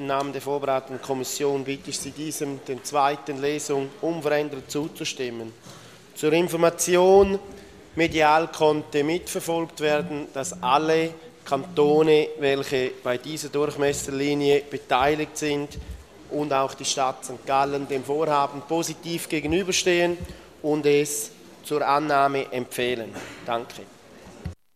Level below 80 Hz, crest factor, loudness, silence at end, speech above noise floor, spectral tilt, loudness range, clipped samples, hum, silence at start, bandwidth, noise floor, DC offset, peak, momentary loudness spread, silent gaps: -52 dBFS; 20 dB; -24 LUFS; 0.2 s; 22 dB; -4 dB/octave; 5 LU; under 0.1%; none; 0 s; 15 kHz; -46 dBFS; under 0.1%; -4 dBFS; 13 LU; none